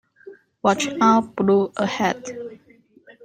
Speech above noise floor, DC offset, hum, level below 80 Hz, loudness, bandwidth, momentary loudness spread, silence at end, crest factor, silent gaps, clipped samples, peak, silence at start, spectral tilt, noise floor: 35 dB; under 0.1%; none; -64 dBFS; -20 LUFS; 16 kHz; 16 LU; 0.15 s; 20 dB; none; under 0.1%; -4 dBFS; 0.25 s; -5 dB/octave; -54 dBFS